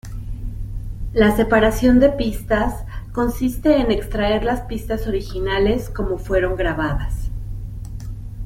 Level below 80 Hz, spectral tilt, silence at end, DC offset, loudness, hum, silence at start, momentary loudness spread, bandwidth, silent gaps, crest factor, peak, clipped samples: -28 dBFS; -6.5 dB/octave; 0 s; under 0.1%; -19 LUFS; none; 0.05 s; 17 LU; 16.5 kHz; none; 18 dB; -2 dBFS; under 0.1%